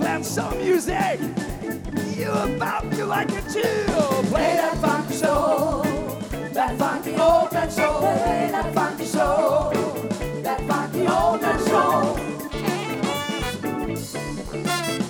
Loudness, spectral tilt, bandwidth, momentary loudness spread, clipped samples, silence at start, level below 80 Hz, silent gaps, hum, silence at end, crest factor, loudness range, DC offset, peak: -23 LUFS; -5 dB/octave; 19.5 kHz; 8 LU; under 0.1%; 0 s; -40 dBFS; none; none; 0 s; 16 dB; 3 LU; under 0.1%; -6 dBFS